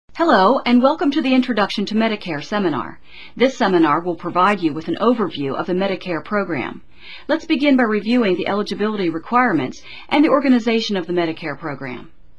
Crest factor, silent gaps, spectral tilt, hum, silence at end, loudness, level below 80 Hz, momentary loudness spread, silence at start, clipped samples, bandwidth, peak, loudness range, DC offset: 18 dB; none; -6 dB/octave; none; 0.35 s; -18 LUFS; -54 dBFS; 13 LU; 0.15 s; under 0.1%; 8.4 kHz; 0 dBFS; 3 LU; 1%